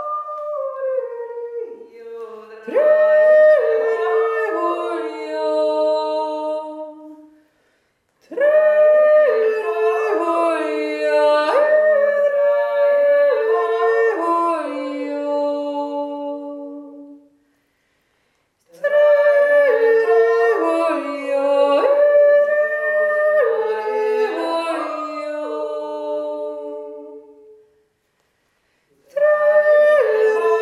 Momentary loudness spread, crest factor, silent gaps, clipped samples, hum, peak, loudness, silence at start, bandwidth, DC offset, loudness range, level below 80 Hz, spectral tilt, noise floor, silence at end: 16 LU; 14 dB; none; under 0.1%; none; -4 dBFS; -17 LUFS; 0 s; 11 kHz; under 0.1%; 11 LU; -76 dBFS; -3 dB/octave; -67 dBFS; 0 s